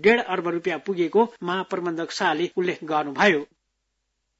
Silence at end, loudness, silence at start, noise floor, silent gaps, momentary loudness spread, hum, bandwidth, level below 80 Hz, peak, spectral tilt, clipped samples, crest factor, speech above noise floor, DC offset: 0.95 s; -24 LUFS; 0 s; -76 dBFS; none; 8 LU; none; 8 kHz; -70 dBFS; -6 dBFS; -5 dB/octave; under 0.1%; 18 dB; 53 dB; under 0.1%